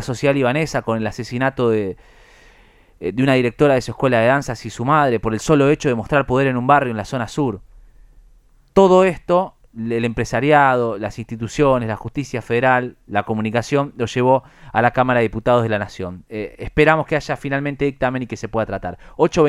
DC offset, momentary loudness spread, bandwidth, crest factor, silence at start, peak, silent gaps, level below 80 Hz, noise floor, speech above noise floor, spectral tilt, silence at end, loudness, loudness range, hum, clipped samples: under 0.1%; 12 LU; 13 kHz; 18 dB; 0 s; 0 dBFS; none; -42 dBFS; -51 dBFS; 33 dB; -6.5 dB/octave; 0 s; -18 LUFS; 3 LU; none; under 0.1%